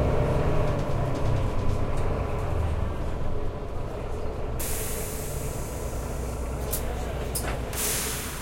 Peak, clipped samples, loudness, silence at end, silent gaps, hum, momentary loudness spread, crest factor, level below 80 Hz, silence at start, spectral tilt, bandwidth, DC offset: -12 dBFS; under 0.1%; -30 LUFS; 0 s; none; none; 8 LU; 14 dB; -32 dBFS; 0 s; -5 dB/octave; 16.5 kHz; under 0.1%